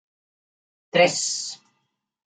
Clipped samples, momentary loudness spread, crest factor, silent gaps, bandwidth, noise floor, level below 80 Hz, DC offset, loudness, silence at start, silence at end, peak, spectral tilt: under 0.1%; 16 LU; 22 dB; none; 9.6 kHz; -75 dBFS; -76 dBFS; under 0.1%; -21 LUFS; 0.95 s; 0.7 s; -4 dBFS; -2 dB/octave